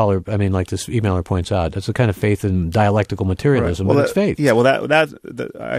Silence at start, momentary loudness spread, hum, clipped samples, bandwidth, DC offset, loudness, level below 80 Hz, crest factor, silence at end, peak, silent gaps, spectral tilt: 0 s; 7 LU; none; under 0.1%; 14.5 kHz; under 0.1%; -18 LUFS; -38 dBFS; 16 dB; 0 s; -2 dBFS; none; -6.5 dB/octave